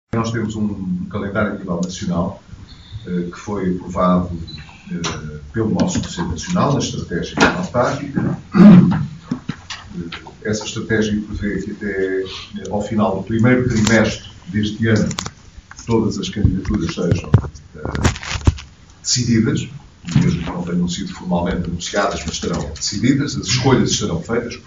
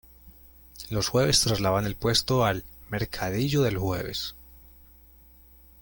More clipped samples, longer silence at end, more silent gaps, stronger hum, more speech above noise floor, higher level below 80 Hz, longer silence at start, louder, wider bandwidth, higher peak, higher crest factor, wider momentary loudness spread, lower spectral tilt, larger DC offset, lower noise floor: neither; second, 0.05 s vs 1.25 s; neither; neither; second, 22 dB vs 28 dB; first, -34 dBFS vs -46 dBFS; about the same, 0.15 s vs 0.25 s; first, -18 LUFS vs -26 LUFS; second, 8 kHz vs 17 kHz; first, 0 dBFS vs -8 dBFS; about the same, 18 dB vs 20 dB; about the same, 13 LU vs 12 LU; first, -5.5 dB/octave vs -4 dB/octave; first, 0.2% vs under 0.1%; second, -39 dBFS vs -54 dBFS